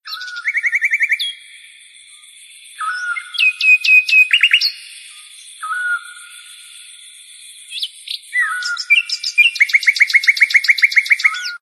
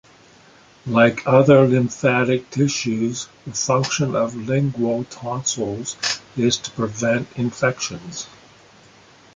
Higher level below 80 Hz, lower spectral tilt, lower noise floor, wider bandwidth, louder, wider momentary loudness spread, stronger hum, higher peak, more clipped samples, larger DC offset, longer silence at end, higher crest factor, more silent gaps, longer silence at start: second, -76 dBFS vs -56 dBFS; second, 7 dB/octave vs -5 dB/octave; second, -43 dBFS vs -50 dBFS; first, 14.5 kHz vs 9.6 kHz; first, -13 LUFS vs -20 LUFS; first, 18 LU vs 13 LU; neither; about the same, 0 dBFS vs -2 dBFS; neither; neither; second, 0.05 s vs 1.1 s; about the same, 16 dB vs 18 dB; neither; second, 0.05 s vs 0.85 s